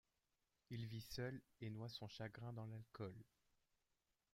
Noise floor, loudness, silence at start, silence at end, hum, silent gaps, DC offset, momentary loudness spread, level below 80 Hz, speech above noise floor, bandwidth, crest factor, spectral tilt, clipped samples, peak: -89 dBFS; -53 LUFS; 0.7 s; 1.1 s; none; none; under 0.1%; 5 LU; -76 dBFS; 37 dB; 16 kHz; 20 dB; -6 dB/octave; under 0.1%; -34 dBFS